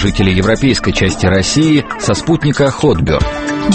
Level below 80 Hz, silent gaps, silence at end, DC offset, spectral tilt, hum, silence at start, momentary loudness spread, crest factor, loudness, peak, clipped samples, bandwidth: -26 dBFS; none; 0 s; under 0.1%; -5.5 dB/octave; none; 0 s; 4 LU; 12 dB; -12 LUFS; 0 dBFS; under 0.1%; 8.8 kHz